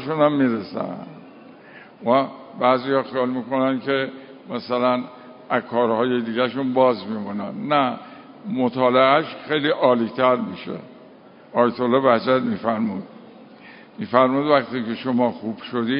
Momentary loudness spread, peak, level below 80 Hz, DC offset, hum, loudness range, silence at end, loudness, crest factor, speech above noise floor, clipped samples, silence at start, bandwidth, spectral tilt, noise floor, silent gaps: 15 LU; 0 dBFS; -66 dBFS; under 0.1%; none; 3 LU; 0 s; -21 LUFS; 20 dB; 26 dB; under 0.1%; 0 s; 5.4 kHz; -10.5 dB/octave; -46 dBFS; none